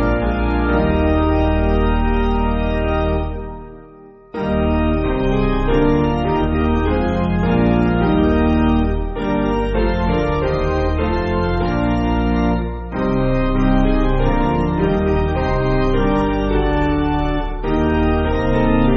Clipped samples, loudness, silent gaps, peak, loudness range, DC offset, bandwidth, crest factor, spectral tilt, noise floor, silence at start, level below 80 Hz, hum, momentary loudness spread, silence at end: under 0.1%; -18 LUFS; none; -2 dBFS; 3 LU; under 0.1%; 6.6 kHz; 14 dB; -6.5 dB/octave; -42 dBFS; 0 s; -22 dBFS; none; 5 LU; 0 s